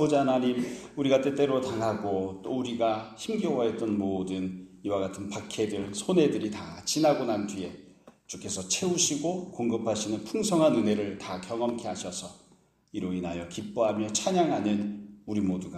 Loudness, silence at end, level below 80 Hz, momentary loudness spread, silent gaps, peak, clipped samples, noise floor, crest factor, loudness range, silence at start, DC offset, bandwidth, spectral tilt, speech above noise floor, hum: -29 LUFS; 0 s; -64 dBFS; 12 LU; none; -10 dBFS; under 0.1%; -62 dBFS; 18 dB; 3 LU; 0 s; under 0.1%; 14 kHz; -4.5 dB/octave; 34 dB; none